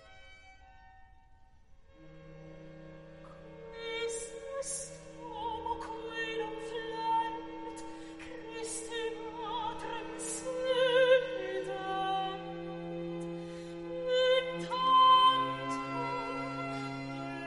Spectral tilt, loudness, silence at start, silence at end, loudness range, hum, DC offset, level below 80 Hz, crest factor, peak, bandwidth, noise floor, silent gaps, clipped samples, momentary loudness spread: -3 dB/octave; -33 LUFS; 0 s; 0 s; 13 LU; none; under 0.1%; -62 dBFS; 20 dB; -14 dBFS; 11.5 kHz; -59 dBFS; none; under 0.1%; 21 LU